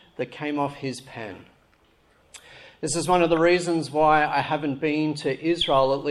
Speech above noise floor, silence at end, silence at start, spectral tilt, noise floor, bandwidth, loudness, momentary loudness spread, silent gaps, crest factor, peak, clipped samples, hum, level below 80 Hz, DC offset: 38 dB; 0 s; 0.2 s; -4.5 dB/octave; -61 dBFS; 12.5 kHz; -23 LUFS; 15 LU; none; 18 dB; -6 dBFS; under 0.1%; none; -52 dBFS; under 0.1%